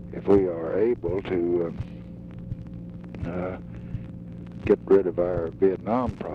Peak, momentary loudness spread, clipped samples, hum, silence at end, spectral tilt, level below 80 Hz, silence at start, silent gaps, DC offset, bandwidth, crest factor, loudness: -10 dBFS; 18 LU; under 0.1%; none; 0 s; -10 dB/octave; -46 dBFS; 0 s; none; under 0.1%; 5 kHz; 16 dB; -25 LUFS